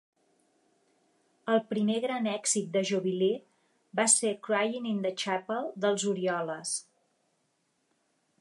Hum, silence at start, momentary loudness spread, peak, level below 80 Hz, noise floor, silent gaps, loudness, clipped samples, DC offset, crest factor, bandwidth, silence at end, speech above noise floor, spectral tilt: none; 1.45 s; 10 LU; -10 dBFS; -86 dBFS; -75 dBFS; none; -29 LUFS; under 0.1%; under 0.1%; 22 dB; 11.5 kHz; 1.6 s; 46 dB; -3 dB/octave